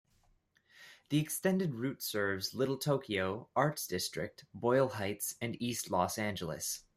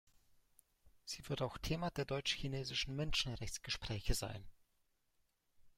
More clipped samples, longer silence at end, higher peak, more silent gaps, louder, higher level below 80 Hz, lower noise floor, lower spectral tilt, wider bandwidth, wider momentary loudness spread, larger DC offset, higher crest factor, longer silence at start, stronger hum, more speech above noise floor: neither; about the same, 0.15 s vs 0.1 s; first, -14 dBFS vs -20 dBFS; neither; first, -35 LUFS vs -41 LUFS; second, -72 dBFS vs -50 dBFS; second, -72 dBFS vs -80 dBFS; about the same, -4.5 dB/octave vs -4 dB/octave; about the same, 16 kHz vs 16 kHz; second, 6 LU vs 10 LU; neither; about the same, 22 dB vs 22 dB; about the same, 0.8 s vs 0.85 s; neither; about the same, 37 dB vs 39 dB